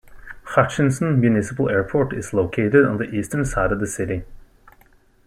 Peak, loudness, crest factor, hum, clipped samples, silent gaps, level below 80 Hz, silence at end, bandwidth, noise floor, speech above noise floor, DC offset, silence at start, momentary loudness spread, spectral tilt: -2 dBFS; -20 LUFS; 18 dB; none; under 0.1%; none; -40 dBFS; 0.9 s; 13.5 kHz; -54 dBFS; 35 dB; under 0.1%; 0.1 s; 8 LU; -7 dB/octave